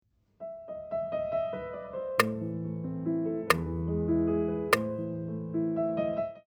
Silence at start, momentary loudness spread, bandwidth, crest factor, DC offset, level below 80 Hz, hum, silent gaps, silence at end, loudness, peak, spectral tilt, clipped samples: 0.4 s; 10 LU; 20 kHz; 26 dB; under 0.1%; -52 dBFS; none; none; 0.1 s; -31 LUFS; -4 dBFS; -6 dB/octave; under 0.1%